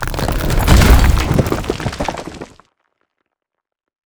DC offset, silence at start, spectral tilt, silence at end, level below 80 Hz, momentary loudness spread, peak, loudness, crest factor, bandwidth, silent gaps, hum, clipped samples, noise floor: under 0.1%; 0 s; -5.5 dB/octave; 1.65 s; -18 dBFS; 20 LU; 0 dBFS; -15 LUFS; 16 dB; over 20 kHz; none; none; 0.1%; -80 dBFS